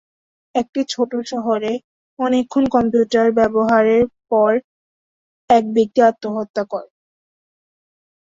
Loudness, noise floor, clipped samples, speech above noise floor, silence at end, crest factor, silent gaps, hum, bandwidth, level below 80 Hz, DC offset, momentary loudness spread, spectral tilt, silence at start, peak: -18 LUFS; under -90 dBFS; under 0.1%; over 74 dB; 1.45 s; 18 dB; 0.69-0.73 s, 1.84-2.17 s, 4.64-5.48 s, 6.50-6.54 s; none; 7.8 kHz; -54 dBFS; under 0.1%; 10 LU; -5.5 dB/octave; 0.55 s; -2 dBFS